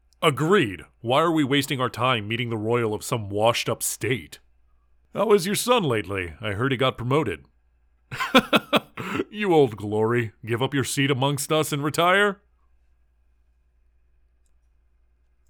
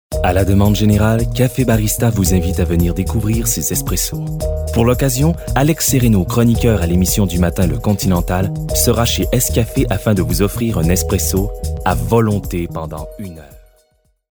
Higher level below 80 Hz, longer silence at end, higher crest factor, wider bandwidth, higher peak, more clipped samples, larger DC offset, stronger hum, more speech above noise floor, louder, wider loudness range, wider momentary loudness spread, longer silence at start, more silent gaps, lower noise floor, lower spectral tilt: second, -58 dBFS vs -24 dBFS; first, 3.15 s vs 0.8 s; first, 20 dB vs 14 dB; about the same, over 20 kHz vs over 20 kHz; second, -4 dBFS vs 0 dBFS; neither; neither; neither; second, 40 dB vs 44 dB; second, -23 LUFS vs -15 LUFS; about the same, 3 LU vs 3 LU; first, 10 LU vs 7 LU; about the same, 0.2 s vs 0.1 s; neither; first, -63 dBFS vs -59 dBFS; about the same, -4.5 dB/octave vs -5.5 dB/octave